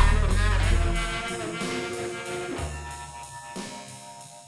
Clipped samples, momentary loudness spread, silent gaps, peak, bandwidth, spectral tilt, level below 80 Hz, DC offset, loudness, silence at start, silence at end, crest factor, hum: under 0.1%; 15 LU; none; -6 dBFS; 12 kHz; -4.5 dB/octave; -28 dBFS; under 0.1%; -29 LUFS; 0 s; 0 s; 20 dB; none